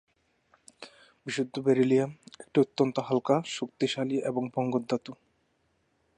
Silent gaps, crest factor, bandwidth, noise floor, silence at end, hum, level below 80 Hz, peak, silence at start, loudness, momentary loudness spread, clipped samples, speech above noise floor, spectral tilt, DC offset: none; 18 dB; 10.5 kHz; -72 dBFS; 1.05 s; none; -76 dBFS; -12 dBFS; 0.8 s; -29 LUFS; 22 LU; under 0.1%; 45 dB; -6 dB/octave; under 0.1%